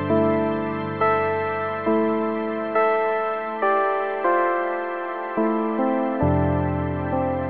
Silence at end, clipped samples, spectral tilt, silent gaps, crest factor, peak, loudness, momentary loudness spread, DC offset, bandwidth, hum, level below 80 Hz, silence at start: 0 s; under 0.1%; -11 dB/octave; none; 14 dB; -8 dBFS; -23 LUFS; 5 LU; 0.3%; 4.7 kHz; none; -52 dBFS; 0 s